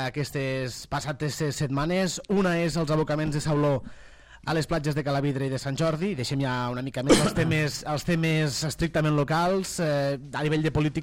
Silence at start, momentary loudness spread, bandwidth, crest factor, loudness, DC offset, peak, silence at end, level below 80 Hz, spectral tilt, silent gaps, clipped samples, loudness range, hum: 0 s; 6 LU; 16.5 kHz; 20 dB; -26 LUFS; under 0.1%; -6 dBFS; 0 s; -46 dBFS; -5.5 dB/octave; none; under 0.1%; 3 LU; none